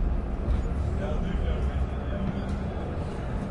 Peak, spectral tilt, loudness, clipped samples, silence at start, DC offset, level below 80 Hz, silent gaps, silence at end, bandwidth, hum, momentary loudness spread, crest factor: -16 dBFS; -8.5 dB/octave; -31 LUFS; under 0.1%; 0 s; under 0.1%; -30 dBFS; none; 0 s; 10 kHz; none; 4 LU; 12 dB